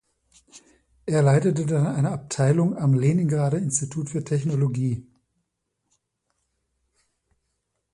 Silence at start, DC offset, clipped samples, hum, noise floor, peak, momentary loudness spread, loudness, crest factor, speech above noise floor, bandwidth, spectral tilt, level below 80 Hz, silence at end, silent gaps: 0.55 s; under 0.1%; under 0.1%; none; -78 dBFS; -8 dBFS; 8 LU; -23 LUFS; 16 dB; 56 dB; 11 kHz; -7 dB/octave; -58 dBFS; 2.9 s; none